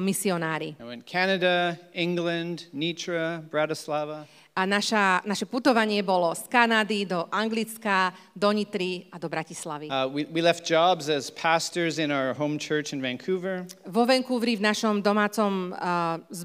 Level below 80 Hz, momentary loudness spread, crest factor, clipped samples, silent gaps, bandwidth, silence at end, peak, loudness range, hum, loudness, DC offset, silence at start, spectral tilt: -82 dBFS; 9 LU; 22 dB; under 0.1%; none; 16 kHz; 0 s; -4 dBFS; 4 LU; none; -26 LUFS; under 0.1%; 0 s; -4 dB/octave